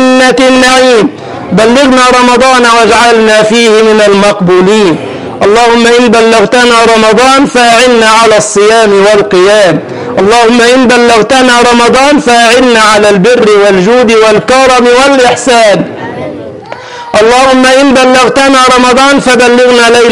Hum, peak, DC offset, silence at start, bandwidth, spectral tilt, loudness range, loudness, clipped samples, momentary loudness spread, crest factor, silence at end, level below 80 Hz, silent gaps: none; 0 dBFS; 1%; 0 s; 14 kHz; -3.5 dB/octave; 2 LU; -3 LUFS; 2%; 7 LU; 4 dB; 0 s; -36 dBFS; none